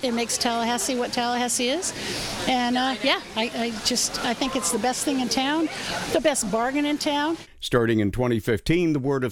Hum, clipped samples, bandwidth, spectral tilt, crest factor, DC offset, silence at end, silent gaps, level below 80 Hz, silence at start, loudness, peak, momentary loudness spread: none; under 0.1%; 18 kHz; -3.5 dB/octave; 18 dB; under 0.1%; 0 s; none; -46 dBFS; 0 s; -24 LUFS; -6 dBFS; 4 LU